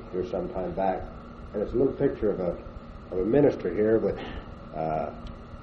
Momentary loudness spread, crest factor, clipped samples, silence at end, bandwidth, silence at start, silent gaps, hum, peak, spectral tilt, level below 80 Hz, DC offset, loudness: 18 LU; 20 dB; under 0.1%; 0 s; 6.2 kHz; 0 s; none; none; -8 dBFS; -9.5 dB/octave; -44 dBFS; under 0.1%; -28 LUFS